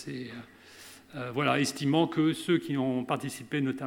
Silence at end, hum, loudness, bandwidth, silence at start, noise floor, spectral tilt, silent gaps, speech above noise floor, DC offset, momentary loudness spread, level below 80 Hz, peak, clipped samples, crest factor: 0 s; none; -29 LUFS; 17 kHz; 0 s; -51 dBFS; -5.5 dB/octave; none; 22 dB; under 0.1%; 21 LU; -74 dBFS; -12 dBFS; under 0.1%; 18 dB